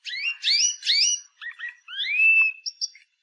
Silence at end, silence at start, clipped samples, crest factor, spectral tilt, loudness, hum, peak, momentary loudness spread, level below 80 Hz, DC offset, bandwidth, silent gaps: 0.35 s; 0.05 s; under 0.1%; 14 dB; 14.5 dB/octave; -20 LUFS; none; -10 dBFS; 18 LU; under -90 dBFS; under 0.1%; 11.5 kHz; none